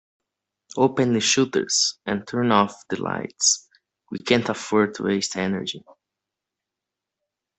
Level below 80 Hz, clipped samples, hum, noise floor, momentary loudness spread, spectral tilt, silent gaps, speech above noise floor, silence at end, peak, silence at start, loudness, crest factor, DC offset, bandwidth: -62 dBFS; under 0.1%; none; -86 dBFS; 10 LU; -3 dB/octave; none; 63 dB; 1.8 s; -2 dBFS; 0.75 s; -22 LUFS; 22 dB; under 0.1%; 8.4 kHz